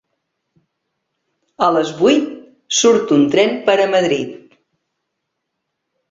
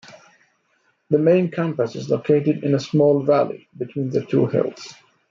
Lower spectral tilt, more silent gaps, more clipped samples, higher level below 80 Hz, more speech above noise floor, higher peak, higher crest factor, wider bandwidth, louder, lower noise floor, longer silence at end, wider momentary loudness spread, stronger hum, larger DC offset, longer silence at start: second, -3.5 dB/octave vs -8 dB/octave; neither; neither; about the same, -62 dBFS vs -66 dBFS; first, 61 dB vs 46 dB; first, 0 dBFS vs -4 dBFS; about the same, 18 dB vs 16 dB; about the same, 8 kHz vs 7.6 kHz; first, -15 LUFS vs -20 LUFS; first, -75 dBFS vs -65 dBFS; first, 1.75 s vs 0.4 s; second, 7 LU vs 11 LU; neither; neither; first, 1.6 s vs 0.1 s